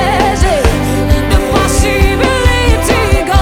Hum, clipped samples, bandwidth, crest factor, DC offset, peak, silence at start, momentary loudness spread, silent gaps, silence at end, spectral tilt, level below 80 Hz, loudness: none; 0.1%; 17.5 kHz; 10 dB; under 0.1%; 0 dBFS; 0 s; 2 LU; none; 0 s; -5 dB/octave; -14 dBFS; -11 LUFS